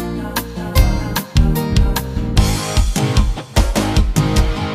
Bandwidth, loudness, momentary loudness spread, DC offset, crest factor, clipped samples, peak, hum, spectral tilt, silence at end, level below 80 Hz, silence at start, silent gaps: 16 kHz; -17 LUFS; 5 LU; under 0.1%; 16 dB; under 0.1%; 0 dBFS; none; -5 dB/octave; 0 s; -18 dBFS; 0 s; none